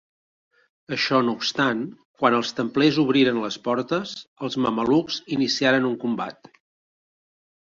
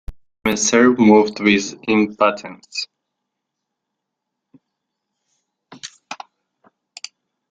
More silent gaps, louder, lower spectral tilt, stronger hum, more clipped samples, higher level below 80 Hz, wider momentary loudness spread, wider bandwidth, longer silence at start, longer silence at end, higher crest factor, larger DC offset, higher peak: first, 2.05-2.14 s, 4.28-4.36 s vs none; second, -22 LUFS vs -16 LUFS; about the same, -5 dB/octave vs -4 dB/octave; neither; neither; second, -64 dBFS vs -48 dBFS; second, 10 LU vs 23 LU; second, 7.6 kHz vs 13.5 kHz; first, 0.9 s vs 0.1 s; about the same, 1.35 s vs 1.35 s; about the same, 20 dB vs 18 dB; neither; about the same, -4 dBFS vs -2 dBFS